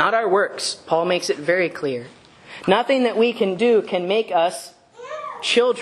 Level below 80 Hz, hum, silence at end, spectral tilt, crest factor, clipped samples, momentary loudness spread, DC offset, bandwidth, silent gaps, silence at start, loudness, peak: -68 dBFS; none; 0 s; -4 dB/octave; 18 dB; under 0.1%; 14 LU; under 0.1%; 12.5 kHz; none; 0 s; -20 LUFS; -2 dBFS